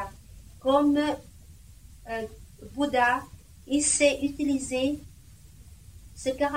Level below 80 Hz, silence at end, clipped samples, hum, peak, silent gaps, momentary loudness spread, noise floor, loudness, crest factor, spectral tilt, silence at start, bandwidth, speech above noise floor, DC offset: -50 dBFS; 0 s; under 0.1%; none; -8 dBFS; none; 17 LU; -51 dBFS; -26 LUFS; 20 dB; -3 dB/octave; 0 s; 16 kHz; 25 dB; 0.1%